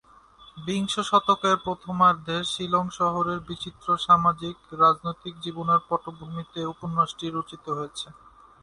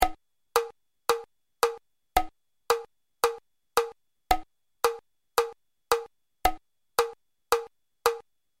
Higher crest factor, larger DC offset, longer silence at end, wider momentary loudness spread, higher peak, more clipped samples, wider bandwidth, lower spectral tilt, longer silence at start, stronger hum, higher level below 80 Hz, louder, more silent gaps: second, 20 dB vs 26 dB; neither; about the same, 0.5 s vs 0.4 s; about the same, 14 LU vs 12 LU; about the same, -6 dBFS vs -4 dBFS; neither; second, 11.5 kHz vs 16.5 kHz; first, -5 dB/octave vs -2 dB/octave; first, 0.4 s vs 0 s; neither; second, -58 dBFS vs -46 dBFS; first, -25 LUFS vs -30 LUFS; neither